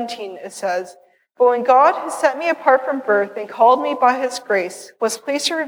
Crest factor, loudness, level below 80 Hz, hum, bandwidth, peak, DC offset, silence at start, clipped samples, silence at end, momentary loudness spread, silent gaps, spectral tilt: 16 dB; -18 LUFS; -82 dBFS; none; 20 kHz; -2 dBFS; under 0.1%; 0 s; under 0.1%; 0 s; 13 LU; none; -2.5 dB/octave